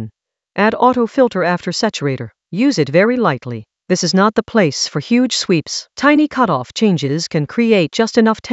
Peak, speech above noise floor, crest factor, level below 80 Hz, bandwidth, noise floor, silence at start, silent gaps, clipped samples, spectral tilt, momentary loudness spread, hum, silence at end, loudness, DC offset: 0 dBFS; 31 dB; 16 dB; -56 dBFS; 8.2 kHz; -45 dBFS; 0 s; none; under 0.1%; -5 dB/octave; 9 LU; none; 0 s; -15 LUFS; under 0.1%